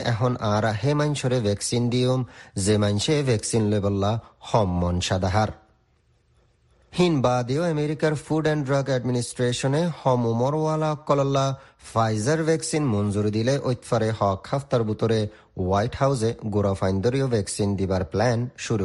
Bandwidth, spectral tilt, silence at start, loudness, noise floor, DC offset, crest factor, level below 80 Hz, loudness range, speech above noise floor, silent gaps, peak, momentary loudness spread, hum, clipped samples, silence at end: 11.5 kHz; -6 dB/octave; 0 s; -24 LUFS; -63 dBFS; under 0.1%; 18 dB; -50 dBFS; 2 LU; 41 dB; none; -6 dBFS; 4 LU; none; under 0.1%; 0 s